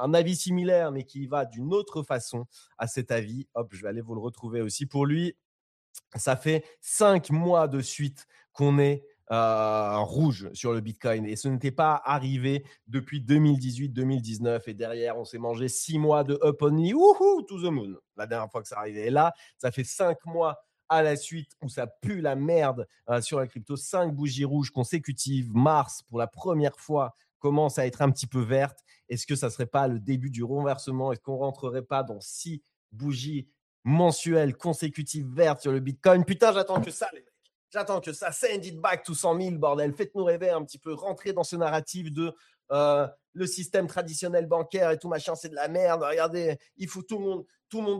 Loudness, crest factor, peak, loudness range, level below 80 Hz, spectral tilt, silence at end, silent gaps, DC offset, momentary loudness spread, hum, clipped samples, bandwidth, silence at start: -27 LUFS; 20 dB; -6 dBFS; 6 LU; -70 dBFS; -6 dB/octave; 0 s; 5.45-5.94 s, 27.35-27.40 s, 32.76-32.89 s, 33.62-33.83 s, 37.55-37.68 s, 43.28-43.33 s; under 0.1%; 12 LU; none; under 0.1%; 14.5 kHz; 0 s